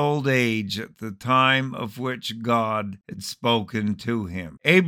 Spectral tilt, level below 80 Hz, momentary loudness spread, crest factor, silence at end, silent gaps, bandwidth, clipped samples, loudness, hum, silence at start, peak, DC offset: -5.5 dB/octave; -60 dBFS; 14 LU; 20 dB; 0 s; none; 19 kHz; under 0.1%; -24 LUFS; none; 0 s; -2 dBFS; under 0.1%